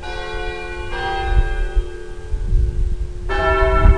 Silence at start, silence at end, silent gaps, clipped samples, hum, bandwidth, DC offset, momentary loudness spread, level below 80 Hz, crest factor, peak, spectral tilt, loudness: 0 s; 0 s; none; under 0.1%; none; 9.8 kHz; 2%; 12 LU; -18 dBFS; 16 dB; -2 dBFS; -6.5 dB/octave; -22 LUFS